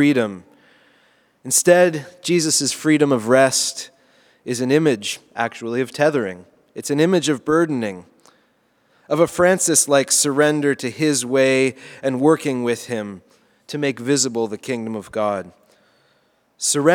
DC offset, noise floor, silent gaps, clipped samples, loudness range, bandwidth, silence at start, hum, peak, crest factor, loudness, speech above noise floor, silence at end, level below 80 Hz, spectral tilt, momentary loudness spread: under 0.1%; -62 dBFS; none; under 0.1%; 6 LU; 19.5 kHz; 0 s; none; 0 dBFS; 20 dB; -18 LUFS; 43 dB; 0 s; -64 dBFS; -3.5 dB/octave; 13 LU